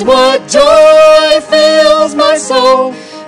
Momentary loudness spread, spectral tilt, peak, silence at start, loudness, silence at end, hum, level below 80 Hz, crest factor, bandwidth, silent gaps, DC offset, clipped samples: 6 LU; -2 dB/octave; 0 dBFS; 0 s; -6 LUFS; 0 s; none; -40 dBFS; 6 dB; 12 kHz; none; under 0.1%; 8%